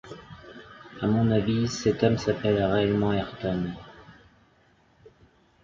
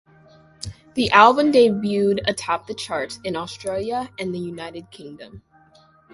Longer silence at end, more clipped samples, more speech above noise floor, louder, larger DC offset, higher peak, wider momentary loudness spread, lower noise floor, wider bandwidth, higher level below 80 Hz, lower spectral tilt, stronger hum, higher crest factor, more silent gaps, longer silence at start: first, 1.5 s vs 0.75 s; neither; about the same, 37 dB vs 34 dB; second, -25 LUFS vs -20 LUFS; neither; second, -8 dBFS vs 0 dBFS; about the same, 22 LU vs 23 LU; first, -62 dBFS vs -54 dBFS; second, 7.4 kHz vs 11.5 kHz; about the same, -50 dBFS vs -52 dBFS; first, -6.5 dB/octave vs -4.5 dB/octave; neither; about the same, 20 dB vs 22 dB; neither; second, 0.05 s vs 0.6 s